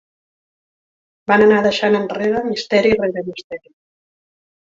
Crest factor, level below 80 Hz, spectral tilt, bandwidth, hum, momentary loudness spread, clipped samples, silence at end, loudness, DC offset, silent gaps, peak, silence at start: 18 dB; -54 dBFS; -5.5 dB/octave; 7.6 kHz; none; 19 LU; under 0.1%; 1.15 s; -16 LUFS; under 0.1%; 3.44-3.50 s; -2 dBFS; 1.3 s